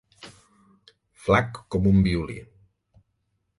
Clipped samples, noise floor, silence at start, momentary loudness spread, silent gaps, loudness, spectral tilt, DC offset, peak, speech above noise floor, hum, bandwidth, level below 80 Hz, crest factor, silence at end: under 0.1%; -74 dBFS; 0.25 s; 26 LU; none; -23 LUFS; -7.5 dB/octave; under 0.1%; -6 dBFS; 52 dB; none; 11.5 kHz; -42 dBFS; 22 dB; 1.2 s